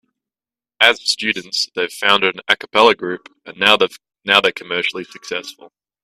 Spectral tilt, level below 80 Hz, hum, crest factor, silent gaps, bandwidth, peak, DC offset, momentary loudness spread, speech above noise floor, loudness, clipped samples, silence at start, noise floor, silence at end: -2 dB/octave; -62 dBFS; none; 18 dB; none; 15 kHz; 0 dBFS; under 0.1%; 14 LU; over 72 dB; -16 LUFS; under 0.1%; 0.8 s; under -90 dBFS; 0.4 s